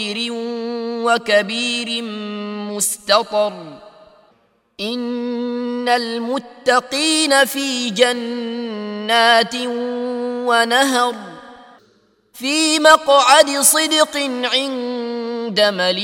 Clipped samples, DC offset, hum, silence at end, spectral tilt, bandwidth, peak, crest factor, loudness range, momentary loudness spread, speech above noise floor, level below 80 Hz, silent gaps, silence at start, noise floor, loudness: under 0.1%; under 0.1%; none; 0 s; -1.5 dB/octave; 16.5 kHz; 0 dBFS; 18 dB; 8 LU; 14 LU; 42 dB; -66 dBFS; none; 0 s; -59 dBFS; -17 LUFS